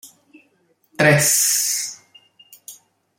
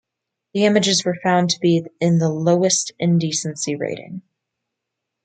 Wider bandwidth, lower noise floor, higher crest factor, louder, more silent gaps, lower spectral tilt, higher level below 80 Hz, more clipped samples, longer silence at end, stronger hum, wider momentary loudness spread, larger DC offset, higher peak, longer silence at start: first, 16.5 kHz vs 9.4 kHz; second, -62 dBFS vs -82 dBFS; about the same, 20 dB vs 18 dB; first, -16 LUFS vs -19 LUFS; neither; second, -2.5 dB/octave vs -4.5 dB/octave; about the same, -60 dBFS vs -64 dBFS; neither; second, 0.45 s vs 1.05 s; neither; first, 23 LU vs 11 LU; neither; about the same, -2 dBFS vs -2 dBFS; second, 0.05 s vs 0.55 s